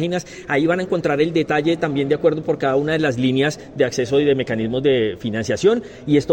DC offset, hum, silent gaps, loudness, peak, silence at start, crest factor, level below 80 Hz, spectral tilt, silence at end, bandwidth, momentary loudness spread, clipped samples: under 0.1%; none; none; -19 LUFS; -4 dBFS; 0 s; 14 dB; -52 dBFS; -6 dB/octave; 0 s; 16.5 kHz; 5 LU; under 0.1%